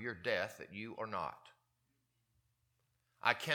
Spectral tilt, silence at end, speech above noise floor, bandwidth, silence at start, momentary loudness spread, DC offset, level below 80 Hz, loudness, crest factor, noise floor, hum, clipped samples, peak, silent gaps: -4 dB/octave; 0 s; 42 dB; 18 kHz; 0 s; 12 LU; under 0.1%; -80 dBFS; -40 LUFS; 30 dB; -81 dBFS; 60 Hz at -80 dBFS; under 0.1%; -12 dBFS; none